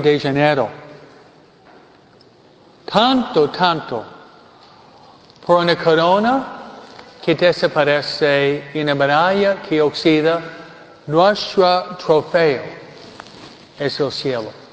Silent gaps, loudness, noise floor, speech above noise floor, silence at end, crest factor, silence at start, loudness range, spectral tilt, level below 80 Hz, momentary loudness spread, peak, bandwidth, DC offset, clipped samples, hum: none; -17 LUFS; -48 dBFS; 32 dB; 0.05 s; 18 dB; 0 s; 4 LU; -6 dB/octave; -58 dBFS; 22 LU; 0 dBFS; 8 kHz; under 0.1%; under 0.1%; none